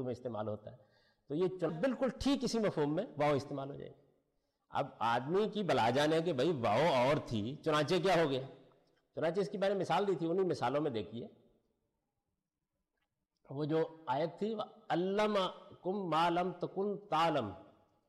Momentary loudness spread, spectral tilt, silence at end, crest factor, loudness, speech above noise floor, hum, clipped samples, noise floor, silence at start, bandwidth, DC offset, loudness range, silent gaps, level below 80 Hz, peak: 12 LU; -6 dB/octave; 0.45 s; 12 dB; -35 LUFS; 54 dB; none; under 0.1%; -88 dBFS; 0 s; 13.5 kHz; under 0.1%; 8 LU; none; -66 dBFS; -24 dBFS